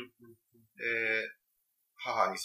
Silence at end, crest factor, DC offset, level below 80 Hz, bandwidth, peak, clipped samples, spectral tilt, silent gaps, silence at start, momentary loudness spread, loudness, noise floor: 0 s; 24 dB; under 0.1%; -86 dBFS; 15.5 kHz; -14 dBFS; under 0.1%; -2.5 dB/octave; none; 0 s; 12 LU; -33 LUFS; -79 dBFS